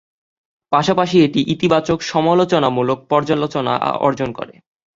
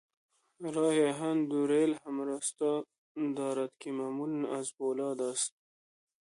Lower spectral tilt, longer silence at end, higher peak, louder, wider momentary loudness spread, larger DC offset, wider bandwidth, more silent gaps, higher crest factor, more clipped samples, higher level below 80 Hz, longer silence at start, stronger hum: first, -6 dB/octave vs -4.5 dB/octave; second, 0.45 s vs 0.85 s; first, -2 dBFS vs -18 dBFS; first, -17 LUFS vs -33 LUFS; second, 5 LU vs 9 LU; neither; second, 7.8 kHz vs 11.5 kHz; second, none vs 2.98-3.15 s; about the same, 16 dB vs 16 dB; neither; first, -52 dBFS vs -84 dBFS; about the same, 0.7 s vs 0.6 s; neither